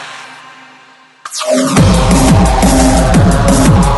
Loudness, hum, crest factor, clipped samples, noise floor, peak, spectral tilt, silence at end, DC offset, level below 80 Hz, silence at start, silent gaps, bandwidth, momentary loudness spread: -9 LUFS; none; 10 dB; under 0.1%; -42 dBFS; 0 dBFS; -5.5 dB/octave; 0 s; under 0.1%; -16 dBFS; 0 s; none; 12 kHz; 12 LU